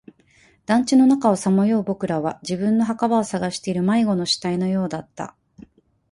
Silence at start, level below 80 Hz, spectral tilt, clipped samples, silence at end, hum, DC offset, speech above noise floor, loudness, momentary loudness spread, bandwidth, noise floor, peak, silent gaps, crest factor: 0.7 s; -60 dBFS; -5.5 dB/octave; under 0.1%; 0.8 s; none; under 0.1%; 37 dB; -20 LUFS; 12 LU; 11.5 kHz; -56 dBFS; -4 dBFS; none; 16 dB